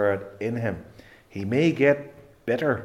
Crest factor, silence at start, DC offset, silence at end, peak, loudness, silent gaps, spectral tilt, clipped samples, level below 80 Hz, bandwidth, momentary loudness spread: 20 dB; 0 s; under 0.1%; 0 s; -6 dBFS; -25 LUFS; none; -7.5 dB/octave; under 0.1%; -62 dBFS; 14 kHz; 18 LU